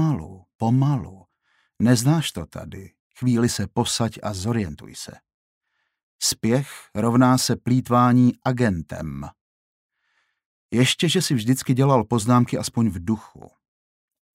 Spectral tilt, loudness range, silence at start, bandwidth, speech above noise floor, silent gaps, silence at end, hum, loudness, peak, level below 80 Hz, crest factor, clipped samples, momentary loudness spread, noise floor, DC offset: -5.5 dB/octave; 5 LU; 0 s; 16 kHz; 49 dB; 0.55-0.59 s, 2.99-3.11 s, 5.34-5.61 s, 6.03-6.19 s, 9.41-9.89 s, 10.46-10.69 s; 1.1 s; none; -21 LUFS; -4 dBFS; -52 dBFS; 18 dB; under 0.1%; 18 LU; -70 dBFS; under 0.1%